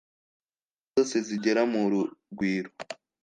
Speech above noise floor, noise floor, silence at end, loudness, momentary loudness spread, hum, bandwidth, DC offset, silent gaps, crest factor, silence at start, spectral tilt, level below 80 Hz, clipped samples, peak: over 62 dB; under -90 dBFS; 0.3 s; -28 LUFS; 13 LU; none; 9.6 kHz; under 0.1%; none; 18 dB; 0.95 s; -5 dB/octave; -72 dBFS; under 0.1%; -12 dBFS